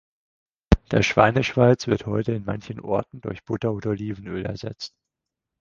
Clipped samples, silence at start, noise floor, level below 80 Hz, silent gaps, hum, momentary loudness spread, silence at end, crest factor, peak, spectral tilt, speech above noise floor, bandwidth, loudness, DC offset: under 0.1%; 0.7 s; -85 dBFS; -36 dBFS; none; none; 15 LU; 0.75 s; 24 dB; 0 dBFS; -6.5 dB/octave; 62 dB; 7.4 kHz; -23 LUFS; under 0.1%